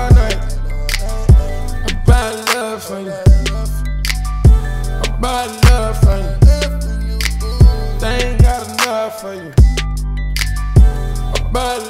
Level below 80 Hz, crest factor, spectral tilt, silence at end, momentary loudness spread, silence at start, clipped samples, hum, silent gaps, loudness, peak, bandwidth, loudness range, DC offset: -14 dBFS; 12 dB; -5.5 dB/octave; 0 s; 10 LU; 0 s; under 0.1%; none; none; -15 LUFS; 0 dBFS; 15.5 kHz; 2 LU; under 0.1%